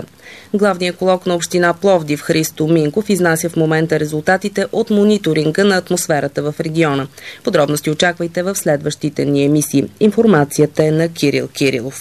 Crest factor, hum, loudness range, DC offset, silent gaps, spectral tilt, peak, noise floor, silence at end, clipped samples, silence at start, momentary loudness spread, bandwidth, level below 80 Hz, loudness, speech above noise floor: 14 dB; none; 2 LU; 0.2%; none; -5 dB/octave; 0 dBFS; -37 dBFS; 0 s; under 0.1%; 0 s; 6 LU; 14 kHz; -54 dBFS; -15 LUFS; 22 dB